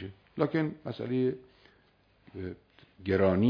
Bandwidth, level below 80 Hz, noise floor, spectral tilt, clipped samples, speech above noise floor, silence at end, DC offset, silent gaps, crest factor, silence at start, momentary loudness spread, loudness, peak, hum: 5.2 kHz; -64 dBFS; -66 dBFS; -10 dB/octave; under 0.1%; 37 dB; 0 s; under 0.1%; none; 20 dB; 0 s; 17 LU; -32 LUFS; -12 dBFS; none